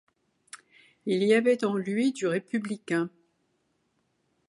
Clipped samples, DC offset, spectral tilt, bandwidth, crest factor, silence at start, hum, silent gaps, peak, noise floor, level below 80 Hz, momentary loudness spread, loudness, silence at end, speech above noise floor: under 0.1%; under 0.1%; -5.5 dB/octave; 11.5 kHz; 18 dB; 0.55 s; none; none; -10 dBFS; -74 dBFS; -80 dBFS; 15 LU; -27 LUFS; 1.4 s; 48 dB